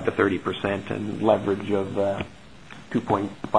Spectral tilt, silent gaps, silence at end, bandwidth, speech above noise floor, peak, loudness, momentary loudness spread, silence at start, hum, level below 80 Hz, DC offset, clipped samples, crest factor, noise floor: -7 dB/octave; none; 0 s; 10.5 kHz; 21 dB; -4 dBFS; -25 LUFS; 10 LU; 0 s; none; -56 dBFS; 0.4%; under 0.1%; 22 dB; -45 dBFS